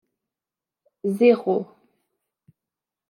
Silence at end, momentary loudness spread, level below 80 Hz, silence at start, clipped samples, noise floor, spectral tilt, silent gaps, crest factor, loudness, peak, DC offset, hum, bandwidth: 1.45 s; 14 LU; -82 dBFS; 1.05 s; under 0.1%; -89 dBFS; -7.5 dB/octave; none; 20 dB; -21 LUFS; -6 dBFS; under 0.1%; none; 13 kHz